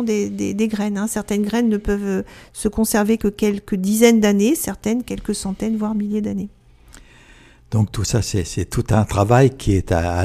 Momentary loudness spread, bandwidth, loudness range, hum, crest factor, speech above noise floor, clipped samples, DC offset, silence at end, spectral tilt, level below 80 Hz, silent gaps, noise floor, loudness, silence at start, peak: 10 LU; 14.5 kHz; 6 LU; none; 18 dB; 29 dB; under 0.1%; under 0.1%; 0 s; -6 dB/octave; -36 dBFS; none; -47 dBFS; -19 LUFS; 0 s; 0 dBFS